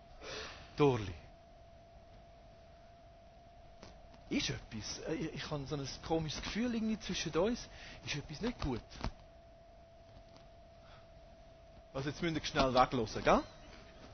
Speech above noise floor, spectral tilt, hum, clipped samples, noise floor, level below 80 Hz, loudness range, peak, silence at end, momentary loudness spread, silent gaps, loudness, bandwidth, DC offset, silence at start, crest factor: 23 dB; -5 dB/octave; none; under 0.1%; -58 dBFS; -54 dBFS; 13 LU; -14 dBFS; 0 s; 27 LU; none; -37 LUFS; 6.6 kHz; under 0.1%; 0 s; 26 dB